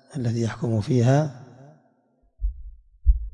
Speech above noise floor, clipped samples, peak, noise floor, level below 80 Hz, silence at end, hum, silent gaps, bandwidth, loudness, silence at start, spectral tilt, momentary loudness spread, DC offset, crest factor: 43 dB; under 0.1%; -6 dBFS; -65 dBFS; -30 dBFS; 0.05 s; none; none; 9.8 kHz; -25 LUFS; 0.1 s; -7.5 dB/octave; 15 LU; under 0.1%; 20 dB